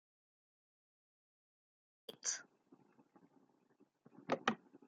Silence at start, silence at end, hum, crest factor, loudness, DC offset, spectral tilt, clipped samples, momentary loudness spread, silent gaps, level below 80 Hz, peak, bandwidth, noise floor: 2.1 s; 0.1 s; none; 32 dB; -42 LUFS; under 0.1%; -2 dB/octave; under 0.1%; 18 LU; none; under -90 dBFS; -18 dBFS; 7.4 kHz; -75 dBFS